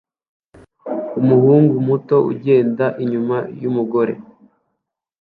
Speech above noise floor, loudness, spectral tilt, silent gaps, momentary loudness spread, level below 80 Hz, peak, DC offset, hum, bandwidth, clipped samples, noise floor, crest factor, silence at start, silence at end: 61 dB; -17 LUFS; -11.5 dB/octave; none; 13 LU; -62 dBFS; -2 dBFS; under 0.1%; none; 4.7 kHz; under 0.1%; -76 dBFS; 16 dB; 0.85 s; 1 s